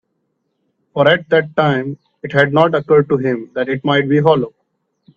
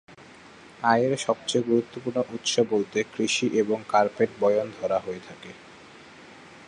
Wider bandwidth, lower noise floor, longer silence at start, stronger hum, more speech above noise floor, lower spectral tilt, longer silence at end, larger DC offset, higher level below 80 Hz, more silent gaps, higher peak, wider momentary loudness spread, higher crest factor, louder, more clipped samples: second, 7 kHz vs 11 kHz; first, -69 dBFS vs -49 dBFS; first, 0.95 s vs 0.1 s; neither; first, 55 dB vs 24 dB; first, -8 dB/octave vs -4 dB/octave; first, 0.65 s vs 0 s; neither; first, -56 dBFS vs -68 dBFS; neither; first, 0 dBFS vs -6 dBFS; second, 10 LU vs 14 LU; about the same, 16 dB vs 20 dB; first, -15 LUFS vs -25 LUFS; neither